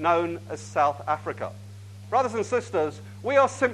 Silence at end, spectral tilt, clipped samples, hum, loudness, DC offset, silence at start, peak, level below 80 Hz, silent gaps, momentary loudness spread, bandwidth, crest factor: 0 s; -5.5 dB/octave; under 0.1%; 50 Hz at -40 dBFS; -26 LUFS; under 0.1%; 0 s; -6 dBFS; -68 dBFS; none; 14 LU; 12.5 kHz; 18 dB